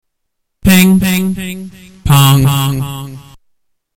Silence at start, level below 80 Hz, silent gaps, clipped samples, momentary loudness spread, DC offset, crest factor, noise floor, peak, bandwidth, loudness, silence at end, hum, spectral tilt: 0.65 s; -32 dBFS; none; under 0.1%; 19 LU; under 0.1%; 12 dB; -69 dBFS; -2 dBFS; 18 kHz; -11 LUFS; 0.75 s; none; -5 dB/octave